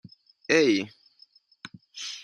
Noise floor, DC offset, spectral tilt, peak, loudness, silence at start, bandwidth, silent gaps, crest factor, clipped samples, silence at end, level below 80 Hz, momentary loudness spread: -59 dBFS; under 0.1%; -3.5 dB/octave; -6 dBFS; -24 LUFS; 0.5 s; 10 kHz; none; 24 dB; under 0.1%; 0 s; -78 dBFS; 25 LU